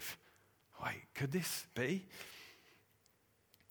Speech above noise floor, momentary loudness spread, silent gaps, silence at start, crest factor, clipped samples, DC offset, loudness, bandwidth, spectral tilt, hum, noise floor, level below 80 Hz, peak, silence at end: 34 dB; 15 LU; none; 0 s; 20 dB; under 0.1%; under 0.1%; -42 LUFS; over 20 kHz; -4 dB/octave; none; -74 dBFS; -76 dBFS; -26 dBFS; 1 s